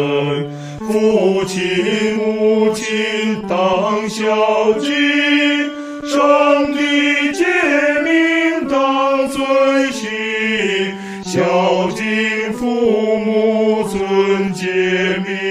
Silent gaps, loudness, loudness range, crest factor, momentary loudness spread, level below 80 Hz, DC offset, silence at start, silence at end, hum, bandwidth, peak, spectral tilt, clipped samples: none; -15 LUFS; 3 LU; 14 dB; 6 LU; -52 dBFS; under 0.1%; 0 s; 0 s; none; 15.5 kHz; 0 dBFS; -4.5 dB/octave; under 0.1%